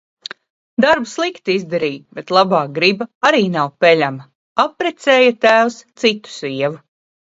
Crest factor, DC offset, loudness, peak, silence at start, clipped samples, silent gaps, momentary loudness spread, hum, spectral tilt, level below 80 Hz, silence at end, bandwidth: 16 dB; under 0.1%; -16 LUFS; 0 dBFS; 0.8 s; under 0.1%; 3.15-3.21 s, 4.35-4.56 s; 13 LU; none; -4.5 dB/octave; -62 dBFS; 0.45 s; 8 kHz